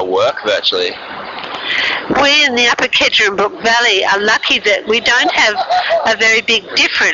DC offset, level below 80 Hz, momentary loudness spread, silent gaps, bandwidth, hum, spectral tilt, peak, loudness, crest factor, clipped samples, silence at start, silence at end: under 0.1%; -48 dBFS; 8 LU; none; 7.6 kHz; none; 1.5 dB/octave; -2 dBFS; -11 LUFS; 10 dB; under 0.1%; 0 s; 0 s